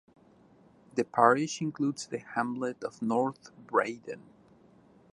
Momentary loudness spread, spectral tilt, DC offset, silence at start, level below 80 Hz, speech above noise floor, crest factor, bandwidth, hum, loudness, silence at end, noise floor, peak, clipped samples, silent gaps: 16 LU; -5 dB/octave; under 0.1%; 0.95 s; -76 dBFS; 30 dB; 24 dB; 11.5 kHz; none; -30 LUFS; 0.95 s; -60 dBFS; -8 dBFS; under 0.1%; none